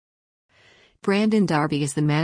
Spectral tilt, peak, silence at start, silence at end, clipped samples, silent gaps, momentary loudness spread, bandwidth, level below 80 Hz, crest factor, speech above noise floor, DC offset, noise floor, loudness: -6 dB/octave; -10 dBFS; 1.05 s; 0 s; under 0.1%; none; 4 LU; 10.5 kHz; -60 dBFS; 14 dB; 36 dB; under 0.1%; -56 dBFS; -22 LUFS